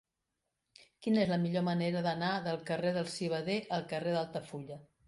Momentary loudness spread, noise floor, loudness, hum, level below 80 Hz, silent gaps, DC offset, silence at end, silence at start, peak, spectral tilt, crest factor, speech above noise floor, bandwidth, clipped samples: 10 LU; -86 dBFS; -34 LUFS; none; -72 dBFS; none; under 0.1%; 0.25 s; 1 s; -18 dBFS; -6.5 dB/octave; 18 dB; 53 dB; 11.5 kHz; under 0.1%